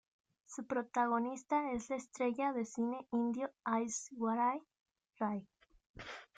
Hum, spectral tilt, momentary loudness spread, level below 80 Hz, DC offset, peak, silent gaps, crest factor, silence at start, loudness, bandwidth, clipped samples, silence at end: none; -4.5 dB/octave; 11 LU; -72 dBFS; under 0.1%; -22 dBFS; 4.80-4.86 s, 5.86-5.94 s; 16 dB; 0.5 s; -38 LUFS; 9.4 kHz; under 0.1%; 0.15 s